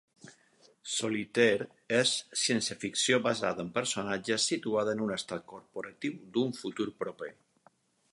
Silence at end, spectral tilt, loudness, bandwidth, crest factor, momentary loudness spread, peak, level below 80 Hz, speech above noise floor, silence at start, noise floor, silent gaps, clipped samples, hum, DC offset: 0.8 s; -3 dB/octave; -31 LUFS; 11.5 kHz; 22 dB; 13 LU; -10 dBFS; -74 dBFS; 35 dB; 0.25 s; -67 dBFS; none; under 0.1%; none; under 0.1%